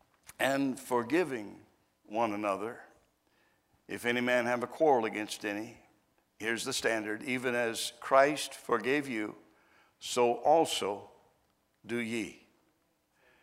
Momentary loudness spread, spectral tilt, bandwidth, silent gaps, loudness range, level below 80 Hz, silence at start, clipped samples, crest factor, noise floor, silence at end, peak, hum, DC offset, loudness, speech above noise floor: 14 LU; -3.5 dB/octave; 16 kHz; none; 4 LU; -76 dBFS; 0.4 s; under 0.1%; 24 dB; -74 dBFS; 1.05 s; -10 dBFS; none; under 0.1%; -31 LUFS; 43 dB